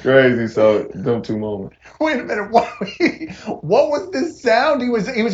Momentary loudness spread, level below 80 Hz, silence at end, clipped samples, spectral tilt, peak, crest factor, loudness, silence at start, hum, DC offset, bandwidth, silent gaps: 11 LU; -52 dBFS; 0 s; under 0.1%; -6 dB/octave; 0 dBFS; 18 dB; -18 LUFS; 0 s; none; under 0.1%; 8 kHz; none